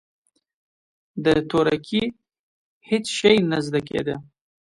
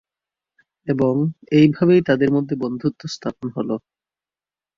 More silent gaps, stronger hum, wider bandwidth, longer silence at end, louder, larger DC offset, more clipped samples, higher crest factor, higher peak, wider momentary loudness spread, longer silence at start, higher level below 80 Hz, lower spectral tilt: first, 2.39-2.81 s vs none; neither; first, 11.5 kHz vs 7.4 kHz; second, 0.45 s vs 1 s; second, -22 LUFS vs -19 LUFS; neither; neither; about the same, 20 dB vs 18 dB; about the same, -4 dBFS vs -2 dBFS; about the same, 12 LU vs 13 LU; first, 1.15 s vs 0.85 s; about the same, -54 dBFS vs -58 dBFS; second, -5 dB/octave vs -7.5 dB/octave